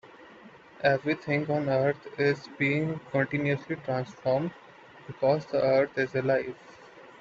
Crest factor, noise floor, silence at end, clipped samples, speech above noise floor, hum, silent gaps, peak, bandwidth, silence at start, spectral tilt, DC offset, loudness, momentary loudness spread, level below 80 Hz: 18 dB; -51 dBFS; 0.1 s; under 0.1%; 24 dB; none; none; -12 dBFS; 7.6 kHz; 0.05 s; -7.5 dB/octave; under 0.1%; -28 LUFS; 7 LU; -66 dBFS